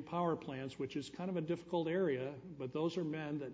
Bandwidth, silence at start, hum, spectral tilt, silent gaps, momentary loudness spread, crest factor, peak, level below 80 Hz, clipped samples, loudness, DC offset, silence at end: 8 kHz; 0 s; none; -7 dB/octave; none; 8 LU; 14 dB; -26 dBFS; -74 dBFS; under 0.1%; -40 LUFS; under 0.1%; 0 s